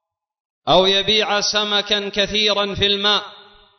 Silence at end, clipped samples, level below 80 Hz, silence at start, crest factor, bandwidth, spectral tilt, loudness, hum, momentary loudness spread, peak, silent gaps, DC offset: 0.4 s; under 0.1%; -46 dBFS; 0.65 s; 16 dB; 6.4 kHz; -2.5 dB/octave; -16 LUFS; none; 5 LU; -4 dBFS; none; under 0.1%